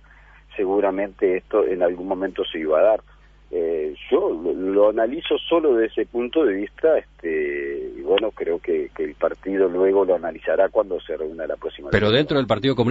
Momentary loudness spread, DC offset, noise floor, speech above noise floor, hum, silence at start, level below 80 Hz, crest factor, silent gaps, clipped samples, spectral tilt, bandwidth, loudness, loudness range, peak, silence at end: 9 LU; under 0.1%; -49 dBFS; 28 dB; 50 Hz at -50 dBFS; 0.5 s; -48 dBFS; 18 dB; none; under 0.1%; -7.5 dB/octave; 7.6 kHz; -22 LUFS; 2 LU; -4 dBFS; 0 s